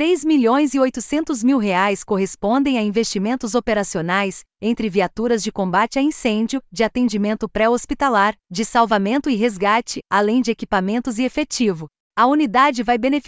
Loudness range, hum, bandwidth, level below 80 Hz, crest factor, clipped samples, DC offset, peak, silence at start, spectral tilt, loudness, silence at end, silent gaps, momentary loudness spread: 2 LU; none; 8 kHz; -48 dBFS; 16 dB; under 0.1%; under 0.1%; -4 dBFS; 0 s; -4.5 dB/octave; -19 LUFS; 0.05 s; 12.00-12.11 s; 6 LU